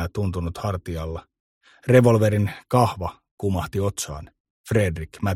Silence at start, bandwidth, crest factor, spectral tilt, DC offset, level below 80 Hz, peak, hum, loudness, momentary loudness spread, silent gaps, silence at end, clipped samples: 0 s; 15.5 kHz; 22 dB; -6.5 dB/octave; under 0.1%; -42 dBFS; -2 dBFS; none; -23 LUFS; 16 LU; 1.40-1.61 s, 3.31-3.38 s, 4.40-4.64 s; 0 s; under 0.1%